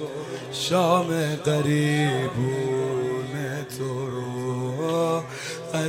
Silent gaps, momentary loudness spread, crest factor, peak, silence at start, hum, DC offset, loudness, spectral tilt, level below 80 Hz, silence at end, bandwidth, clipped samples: none; 9 LU; 18 dB; -8 dBFS; 0 s; none; under 0.1%; -25 LUFS; -5.5 dB/octave; -62 dBFS; 0 s; 16 kHz; under 0.1%